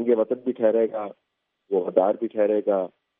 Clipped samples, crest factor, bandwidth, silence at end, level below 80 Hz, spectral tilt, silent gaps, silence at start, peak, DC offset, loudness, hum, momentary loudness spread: under 0.1%; 20 dB; 3.7 kHz; 0.35 s; -82 dBFS; -6.5 dB/octave; none; 0 s; -4 dBFS; under 0.1%; -24 LUFS; none; 6 LU